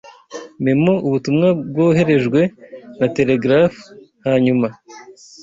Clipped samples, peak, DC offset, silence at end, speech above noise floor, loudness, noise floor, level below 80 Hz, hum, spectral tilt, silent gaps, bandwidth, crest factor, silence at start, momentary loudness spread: under 0.1%; -2 dBFS; under 0.1%; 0.3 s; 19 dB; -16 LUFS; -35 dBFS; -54 dBFS; none; -7.5 dB/octave; none; 7.8 kHz; 14 dB; 0.05 s; 9 LU